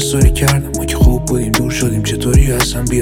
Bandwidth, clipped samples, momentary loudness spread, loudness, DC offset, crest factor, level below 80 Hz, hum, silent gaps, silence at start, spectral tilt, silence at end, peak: 17 kHz; under 0.1%; 5 LU; -14 LUFS; under 0.1%; 12 dB; -16 dBFS; none; none; 0 s; -5 dB/octave; 0 s; 0 dBFS